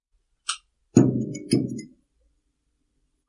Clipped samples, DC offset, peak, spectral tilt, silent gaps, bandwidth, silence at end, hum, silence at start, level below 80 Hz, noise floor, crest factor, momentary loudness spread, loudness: under 0.1%; under 0.1%; -2 dBFS; -6 dB/octave; none; 11.5 kHz; 1.45 s; none; 0.5 s; -58 dBFS; -73 dBFS; 26 dB; 15 LU; -24 LUFS